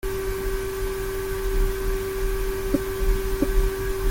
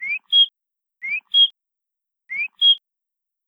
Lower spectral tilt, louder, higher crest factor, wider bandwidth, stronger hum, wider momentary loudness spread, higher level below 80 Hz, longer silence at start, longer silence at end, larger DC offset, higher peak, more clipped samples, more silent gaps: first, -5.5 dB/octave vs 3 dB/octave; second, -27 LUFS vs -16 LUFS; about the same, 16 dB vs 16 dB; first, 17 kHz vs 11 kHz; neither; second, 3 LU vs 11 LU; first, -26 dBFS vs -84 dBFS; about the same, 0.05 s vs 0 s; second, 0 s vs 0.7 s; neither; about the same, -8 dBFS vs -6 dBFS; neither; neither